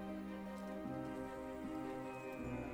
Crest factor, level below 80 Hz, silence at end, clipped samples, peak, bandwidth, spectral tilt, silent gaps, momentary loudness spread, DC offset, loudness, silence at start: 14 dB; -62 dBFS; 0 s; under 0.1%; -32 dBFS; over 20 kHz; -7 dB/octave; none; 2 LU; under 0.1%; -47 LUFS; 0 s